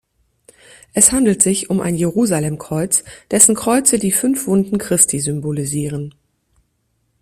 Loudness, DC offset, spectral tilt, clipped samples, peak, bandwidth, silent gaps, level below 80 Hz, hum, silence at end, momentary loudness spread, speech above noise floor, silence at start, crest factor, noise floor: -15 LUFS; under 0.1%; -4 dB/octave; under 0.1%; 0 dBFS; 16 kHz; none; -48 dBFS; none; 1.1 s; 11 LU; 50 dB; 0.95 s; 18 dB; -66 dBFS